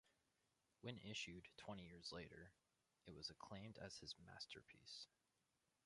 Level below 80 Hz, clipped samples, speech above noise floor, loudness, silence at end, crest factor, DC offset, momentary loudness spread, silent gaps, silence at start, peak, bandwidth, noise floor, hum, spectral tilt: -78 dBFS; under 0.1%; 31 dB; -57 LUFS; 0.8 s; 24 dB; under 0.1%; 9 LU; none; 0.05 s; -36 dBFS; 11 kHz; -88 dBFS; none; -3.5 dB/octave